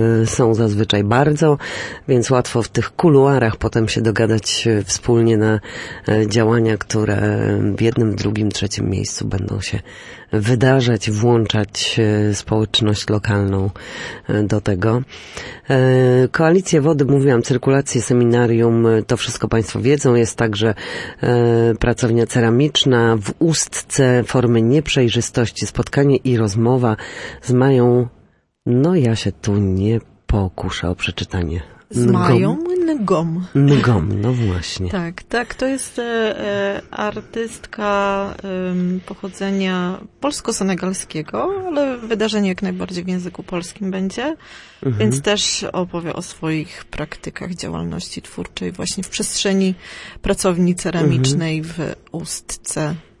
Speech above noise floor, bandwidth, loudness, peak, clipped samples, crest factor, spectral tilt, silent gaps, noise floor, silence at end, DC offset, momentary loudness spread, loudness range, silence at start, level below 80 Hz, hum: 37 dB; 11.5 kHz; -18 LUFS; -2 dBFS; under 0.1%; 16 dB; -5.5 dB/octave; none; -54 dBFS; 0.2 s; under 0.1%; 12 LU; 6 LU; 0 s; -40 dBFS; none